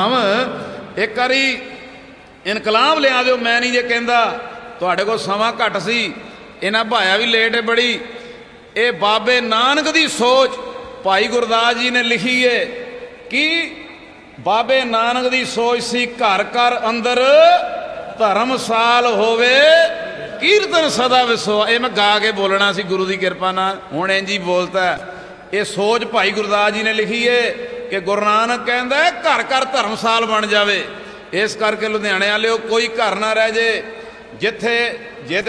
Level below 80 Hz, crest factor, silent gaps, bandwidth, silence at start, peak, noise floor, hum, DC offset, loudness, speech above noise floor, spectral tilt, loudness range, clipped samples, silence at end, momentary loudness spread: -56 dBFS; 16 dB; none; 11 kHz; 0 s; 0 dBFS; -40 dBFS; none; under 0.1%; -15 LUFS; 24 dB; -3 dB/octave; 4 LU; under 0.1%; 0 s; 12 LU